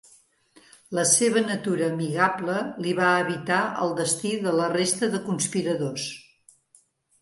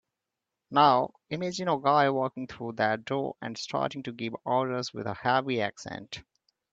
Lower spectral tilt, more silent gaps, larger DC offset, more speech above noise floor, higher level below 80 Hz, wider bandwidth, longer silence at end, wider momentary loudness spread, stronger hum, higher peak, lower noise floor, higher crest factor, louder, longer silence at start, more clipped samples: second, -3.5 dB/octave vs -5 dB/octave; neither; neither; second, 37 dB vs 59 dB; about the same, -70 dBFS vs -68 dBFS; first, 12 kHz vs 8 kHz; first, 1 s vs 0.5 s; second, 8 LU vs 14 LU; neither; about the same, -6 dBFS vs -8 dBFS; second, -62 dBFS vs -87 dBFS; about the same, 20 dB vs 22 dB; first, -24 LUFS vs -28 LUFS; first, 0.9 s vs 0.7 s; neither